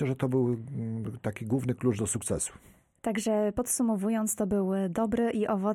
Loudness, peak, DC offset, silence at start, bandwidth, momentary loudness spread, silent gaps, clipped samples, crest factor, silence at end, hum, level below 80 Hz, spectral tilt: -30 LUFS; -16 dBFS; under 0.1%; 0 s; 17 kHz; 7 LU; none; under 0.1%; 14 dB; 0 s; none; -56 dBFS; -6 dB/octave